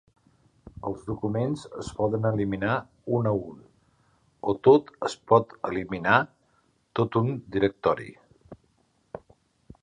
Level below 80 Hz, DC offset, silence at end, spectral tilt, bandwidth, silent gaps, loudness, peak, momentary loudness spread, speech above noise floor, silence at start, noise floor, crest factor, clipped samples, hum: -56 dBFS; under 0.1%; 0.65 s; -7 dB/octave; 10 kHz; none; -26 LUFS; -4 dBFS; 15 LU; 42 dB; 0.85 s; -67 dBFS; 24 dB; under 0.1%; none